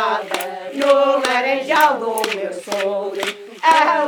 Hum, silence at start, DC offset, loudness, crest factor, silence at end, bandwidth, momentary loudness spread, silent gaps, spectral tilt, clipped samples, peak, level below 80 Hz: none; 0 s; under 0.1%; -18 LUFS; 18 dB; 0 s; 19.5 kHz; 10 LU; none; -2 dB/octave; under 0.1%; 0 dBFS; -80 dBFS